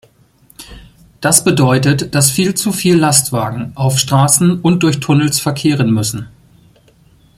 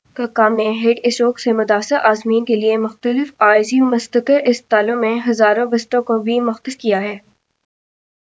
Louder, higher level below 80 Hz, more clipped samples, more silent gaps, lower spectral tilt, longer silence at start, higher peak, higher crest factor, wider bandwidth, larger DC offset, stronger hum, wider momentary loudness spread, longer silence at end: first, -12 LUFS vs -16 LUFS; first, -46 dBFS vs -70 dBFS; neither; neither; about the same, -4.5 dB/octave vs -4.5 dB/octave; first, 0.6 s vs 0.15 s; about the same, 0 dBFS vs 0 dBFS; about the same, 14 dB vs 16 dB; first, 16.5 kHz vs 8 kHz; neither; neither; about the same, 8 LU vs 6 LU; about the same, 1.1 s vs 1.1 s